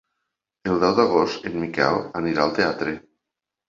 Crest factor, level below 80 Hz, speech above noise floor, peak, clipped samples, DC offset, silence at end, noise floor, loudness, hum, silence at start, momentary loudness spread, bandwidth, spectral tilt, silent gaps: 22 dB; -54 dBFS; 64 dB; -2 dBFS; under 0.1%; under 0.1%; 0.7 s; -85 dBFS; -22 LUFS; none; 0.65 s; 10 LU; 7.6 kHz; -6 dB/octave; none